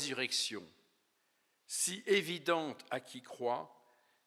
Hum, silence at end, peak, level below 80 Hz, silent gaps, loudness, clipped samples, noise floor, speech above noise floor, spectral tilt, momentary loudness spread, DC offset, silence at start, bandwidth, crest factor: none; 0.6 s; -18 dBFS; under -90 dBFS; none; -36 LUFS; under 0.1%; -78 dBFS; 41 dB; -2 dB/octave; 12 LU; under 0.1%; 0 s; 16 kHz; 20 dB